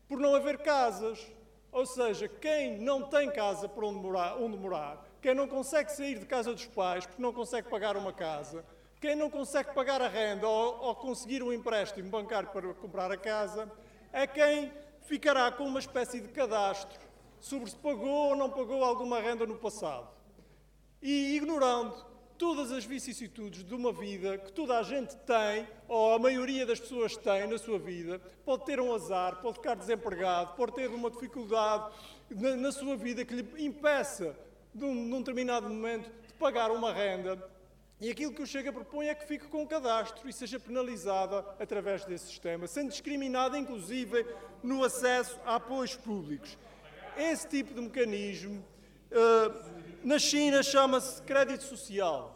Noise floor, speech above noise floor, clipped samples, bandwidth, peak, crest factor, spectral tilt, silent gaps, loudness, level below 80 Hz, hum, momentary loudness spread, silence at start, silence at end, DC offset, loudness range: -62 dBFS; 29 dB; under 0.1%; 16.5 kHz; -12 dBFS; 22 dB; -3.5 dB/octave; none; -33 LUFS; -64 dBFS; none; 13 LU; 0.1 s; 0 s; under 0.1%; 5 LU